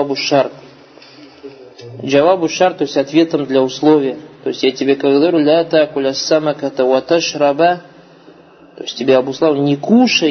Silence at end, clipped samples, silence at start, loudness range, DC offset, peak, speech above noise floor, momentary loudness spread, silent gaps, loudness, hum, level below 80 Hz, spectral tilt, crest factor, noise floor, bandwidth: 0 s; under 0.1%; 0 s; 3 LU; under 0.1%; 0 dBFS; 29 dB; 10 LU; none; -14 LUFS; none; -62 dBFS; -5 dB/octave; 14 dB; -42 dBFS; 6.6 kHz